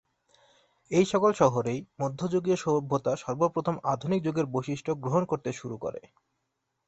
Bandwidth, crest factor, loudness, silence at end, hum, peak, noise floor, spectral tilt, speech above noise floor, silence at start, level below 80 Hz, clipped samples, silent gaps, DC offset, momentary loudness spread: 8.4 kHz; 22 dB; -28 LUFS; 0.9 s; none; -6 dBFS; -80 dBFS; -6.5 dB/octave; 53 dB; 0.9 s; -64 dBFS; under 0.1%; none; under 0.1%; 11 LU